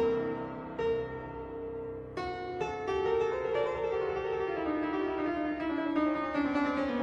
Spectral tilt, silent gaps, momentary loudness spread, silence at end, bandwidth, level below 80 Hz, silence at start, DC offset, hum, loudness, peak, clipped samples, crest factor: -7 dB/octave; none; 9 LU; 0 s; 8 kHz; -56 dBFS; 0 s; under 0.1%; none; -33 LUFS; -18 dBFS; under 0.1%; 14 dB